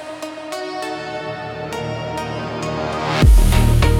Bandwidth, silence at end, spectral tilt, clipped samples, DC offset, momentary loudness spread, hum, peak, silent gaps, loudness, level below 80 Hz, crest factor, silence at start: 16 kHz; 0 s; -6 dB/octave; under 0.1%; under 0.1%; 14 LU; none; -2 dBFS; none; -20 LUFS; -20 dBFS; 16 dB; 0 s